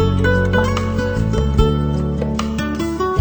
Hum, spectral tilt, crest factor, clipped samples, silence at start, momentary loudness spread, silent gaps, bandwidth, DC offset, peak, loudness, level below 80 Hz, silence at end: none; -7 dB/octave; 16 dB; under 0.1%; 0 s; 5 LU; none; over 20 kHz; under 0.1%; 0 dBFS; -18 LUFS; -24 dBFS; 0 s